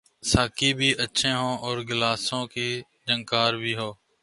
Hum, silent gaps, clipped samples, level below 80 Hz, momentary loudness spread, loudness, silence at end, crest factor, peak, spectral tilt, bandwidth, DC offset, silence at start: none; none; under 0.1%; -44 dBFS; 8 LU; -24 LUFS; 0.3 s; 22 dB; -4 dBFS; -3.5 dB/octave; 11.5 kHz; under 0.1%; 0.25 s